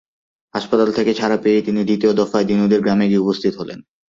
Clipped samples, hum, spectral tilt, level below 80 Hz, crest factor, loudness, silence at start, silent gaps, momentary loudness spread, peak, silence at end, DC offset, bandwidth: under 0.1%; none; -7 dB/octave; -56 dBFS; 14 dB; -17 LUFS; 0.55 s; none; 12 LU; -2 dBFS; 0.3 s; under 0.1%; 7.4 kHz